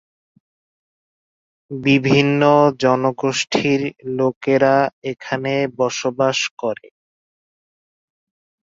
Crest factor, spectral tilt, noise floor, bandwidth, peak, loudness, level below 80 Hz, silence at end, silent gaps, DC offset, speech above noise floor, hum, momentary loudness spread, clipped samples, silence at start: 18 dB; -5 dB/octave; under -90 dBFS; 7.8 kHz; -2 dBFS; -18 LUFS; -60 dBFS; 1.9 s; 4.36-4.41 s, 4.93-5.02 s, 6.51-6.57 s; under 0.1%; over 73 dB; none; 11 LU; under 0.1%; 1.7 s